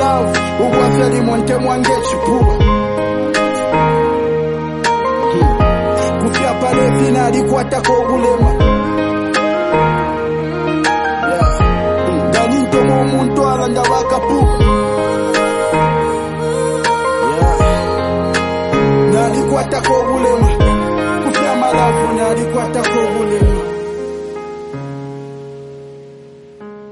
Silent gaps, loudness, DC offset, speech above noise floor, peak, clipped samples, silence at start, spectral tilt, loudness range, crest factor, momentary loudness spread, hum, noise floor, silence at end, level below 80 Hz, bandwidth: none; -14 LUFS; under 0.1%; 24 dB; 0 dBFS; under 0.1%; 0 s; -6 dB/octave; 2 LU; 12 dB; 7 LU; none; -37 dBFS; 0 s; -24 dBFS; 11.5 kHz